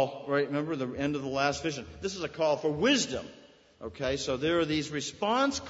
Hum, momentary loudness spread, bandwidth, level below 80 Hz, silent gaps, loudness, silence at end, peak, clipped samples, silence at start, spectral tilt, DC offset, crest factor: none; 10 LU; 8 kHz; -56 dBFS; none; -30 LUFS; 0 s; -12 dBFS; under 0.1%; 0 s; -4 dB/octave; under 0.1%; 18 dB